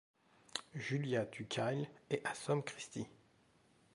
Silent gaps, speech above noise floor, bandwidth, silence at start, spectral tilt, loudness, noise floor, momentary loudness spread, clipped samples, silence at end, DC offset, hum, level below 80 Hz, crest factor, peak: none; 31 dB; 11.5 kHz; 0.55 s; -5 dB/octave; -41 LUFS; -71 dBFS; 9 LU; under 0.1%; 0.8 s; under 0.1%; none; -78 dBFS; 22 dB; -20 dBFS